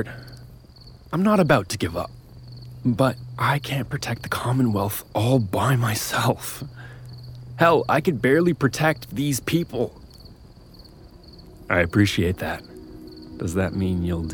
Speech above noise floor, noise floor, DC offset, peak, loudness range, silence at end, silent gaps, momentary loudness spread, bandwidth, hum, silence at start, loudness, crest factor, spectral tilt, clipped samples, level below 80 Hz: 24 dB; -46 dBFS; under 0.1%; -4 dBFS; 4 LU; 0 s; none; 21 LU; over 20 kHz; none; 0 s; -22 LUFS; 18 dB; -5.5 dB/octave; under 0.1%; -48 dBFS